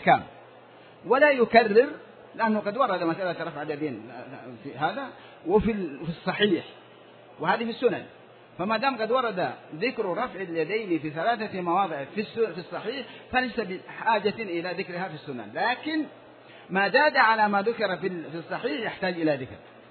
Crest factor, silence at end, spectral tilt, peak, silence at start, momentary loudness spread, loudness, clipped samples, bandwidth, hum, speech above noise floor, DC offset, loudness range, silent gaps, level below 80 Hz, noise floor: 22 dB; 0.1 s; -8.5 dB/octave; -4 dBFS; 0 s; 16 LU; -26 LUFS; under 0.1%; 4.6 kHz; none; 24 dB; under 0.1%; 6 LU; none; -58 dBFS; -50 dBFS